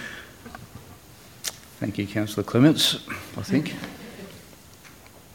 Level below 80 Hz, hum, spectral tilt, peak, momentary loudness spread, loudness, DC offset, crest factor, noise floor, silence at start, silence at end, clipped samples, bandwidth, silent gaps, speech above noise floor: -58 dBFS; none; -4.5 dB/octave; -6 dBFS; 28 LU; -24 LUFS; under 0.1%; 22 dB; -48 dBFS; 0 s; 0.25 s; under 0.1%; 17 kHz; none; 25 dB